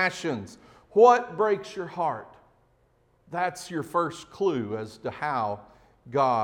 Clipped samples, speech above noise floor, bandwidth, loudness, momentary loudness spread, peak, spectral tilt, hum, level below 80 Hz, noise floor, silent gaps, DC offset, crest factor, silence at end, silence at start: under 0.1%; 39 dB; 15 kHz; -26 LUFS; 17 LU; -4 dBFS; -5.5 dB/octave; none; -66 dBFS; -65 dBFS; none; under 0.1%; 22 dB; 0 s; 0 s